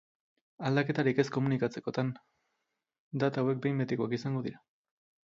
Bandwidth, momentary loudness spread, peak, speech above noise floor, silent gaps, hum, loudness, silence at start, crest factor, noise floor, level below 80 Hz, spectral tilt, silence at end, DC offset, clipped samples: 7.6 kHz; 9 LU; -12 dBFS; 53 dB; 2.99-3.11 s; none; -32 LUFS; 0.6 s; 20 dB; -84 dBFS; -72 dBFS; -7.5 dB/octave; 0.65 s; under 0.1%; under 0.1%